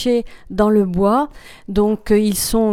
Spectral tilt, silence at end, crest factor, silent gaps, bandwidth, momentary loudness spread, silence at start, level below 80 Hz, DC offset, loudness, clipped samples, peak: -5.5 dB/octave; 0 s; 16 dB; none; 17 kHz; 8 LU; 0 s; -34 dBFS; under 0.1%; -17 LUFS; under 0.1%; 0 dBFS